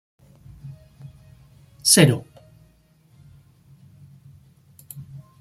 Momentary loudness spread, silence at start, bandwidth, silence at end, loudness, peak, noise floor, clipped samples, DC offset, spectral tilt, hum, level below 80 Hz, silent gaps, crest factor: 29 LU; 0.65 s; 16 kHz; 0.2 s; -17 LUFS; -2 dBFS; -57 dBFS; under 0.1%; under 0.1%; -3.5 dB/octave; none; -58 dBFS; none; 26 dB